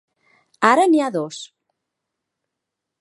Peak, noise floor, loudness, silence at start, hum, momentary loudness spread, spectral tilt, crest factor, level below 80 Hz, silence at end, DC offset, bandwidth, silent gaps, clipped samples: 0 dBFS; -82 dBFS; -17 LUFS; 0.6 s; none; 16 LU; -4.5 dB/octave; 22 dB; -70 dBFS; 1.55 s; under 0.1%; 11.5 kHz; none; under 0.1%